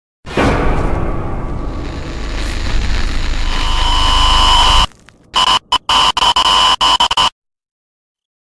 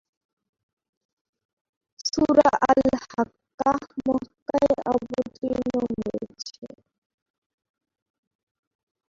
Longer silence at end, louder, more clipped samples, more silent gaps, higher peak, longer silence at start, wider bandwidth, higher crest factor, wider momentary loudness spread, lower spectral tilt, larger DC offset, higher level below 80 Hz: second, 1.15 s vs 2.4 s; first, -13 LUFS vs -24 LUFS; neither; second, none vs 3.54-3.58 s, 4.42-4.46 s, 6.58-6.62 s; first, 0 dBFS vs -4 dBFS; second, 0.25 s vs 2 s; first, 11 kHz vs 7.6 kHz; second, 14 dB vs 24 dB; about the same, 14 LU vs 13 LU; second, -3 dB/octave vs -5 dB/octave; neither; first, -18 dBFS vs -56 dBFS